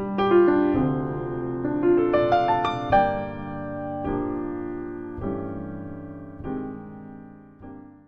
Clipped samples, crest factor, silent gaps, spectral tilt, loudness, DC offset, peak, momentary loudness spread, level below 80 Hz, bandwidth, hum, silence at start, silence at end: under 0.1%; 18 dB; none; -8.5 dB/octave; -24 LUFS; 0.2%; -8 dBFS; 19 LU; -46 dBFS; 6.2 kHz; none; 0 s; 0.05 s